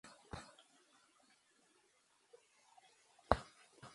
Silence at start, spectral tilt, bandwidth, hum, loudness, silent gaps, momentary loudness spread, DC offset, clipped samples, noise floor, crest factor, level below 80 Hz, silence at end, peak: 0.05 s; -5.5 dB/octave; 11.5 kHz; none; -42 LUFS; none; 22 LU; under 0.1%; under 0.1%; -76 dBFS; 38 dB; -58 dBFS; 0.05 s; -10 dBFS